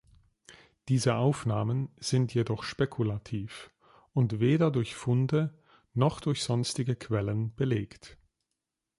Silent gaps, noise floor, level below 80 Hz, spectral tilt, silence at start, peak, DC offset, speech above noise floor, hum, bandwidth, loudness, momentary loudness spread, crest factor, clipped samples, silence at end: none; -86 dBFS; -58 dBFS; -6.5 dB/octave; 0.5 s; -12 dBFS; under 0.1%; 57 dB; none; 11.5 kHz; -30 LUFS; 10 LU; 18 dB; under 0.1%; 0.85 s